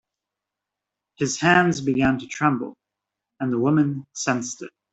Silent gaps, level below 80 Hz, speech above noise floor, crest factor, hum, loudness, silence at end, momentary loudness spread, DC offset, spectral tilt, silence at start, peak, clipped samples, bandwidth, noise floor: none; -54 dBFS; 64 dB; 20 dB; none; -22 LUFS; 0.25 s; 12 LU; under 0.1%; -5 dB/octave; 1.2 s; -4 dBFS; under 0.1%; 8.2 kHz; -86 dBFS